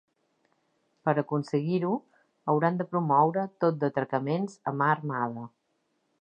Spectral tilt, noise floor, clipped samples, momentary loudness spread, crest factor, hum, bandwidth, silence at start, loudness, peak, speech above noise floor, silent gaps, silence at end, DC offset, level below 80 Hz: -8.5 dB/octave; -75 dBFS; under 0.1%; 9 LU; 20 dB; none; 9 kHz; 1.05 s; -28 LUFS; -10 dBFS; 48 dB; none; 0.7 s; under 0.1%; -80 dBFS